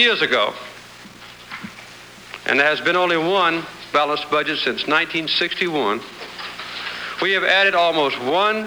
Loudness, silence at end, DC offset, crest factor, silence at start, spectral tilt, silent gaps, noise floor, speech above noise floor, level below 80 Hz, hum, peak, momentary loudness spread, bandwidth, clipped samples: -19 LUFS; 0 s; under 0.1%; 18 dB; 0 s; -3.5 dB/octave; none; -41 dBFS; 22 dB; -60 dBFS; none; -4 dBFS; 21 LU; over 20 kHz; under 0.1%